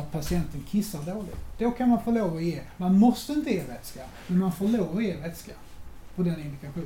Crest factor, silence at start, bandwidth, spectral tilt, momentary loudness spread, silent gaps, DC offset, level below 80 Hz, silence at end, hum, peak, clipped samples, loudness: 16 dB; 0 s; 17 kHz; -7 dB/octave; 18 LU; none; under 0.1%; -46 dBFS; 0 s; none; -10 dBFS; under 0.1%; -27 LUFS